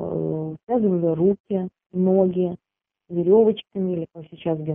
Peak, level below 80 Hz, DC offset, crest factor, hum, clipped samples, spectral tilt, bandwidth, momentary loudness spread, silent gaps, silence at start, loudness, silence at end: -6 dBFS; -60 dBFS; under 0.1%; 16 dB; none; under 0.1%; -12.5 dB/octave; 3.7 kHz; 13 LU; 1.40-1.44 s; 0 s; -22 LUFS; 0 s